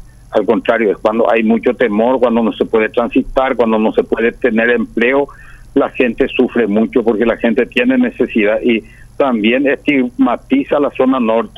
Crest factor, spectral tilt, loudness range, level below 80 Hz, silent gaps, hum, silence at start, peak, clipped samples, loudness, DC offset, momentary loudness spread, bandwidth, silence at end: 12 dB; -7 dB/octave; 1 LU; -40 dBFS; none; none; 0.3 s; 0 dBFS; under 0.1%; -14 LUFS; under 0.1%; 4 LU; 11.5 kHz; 0.1 s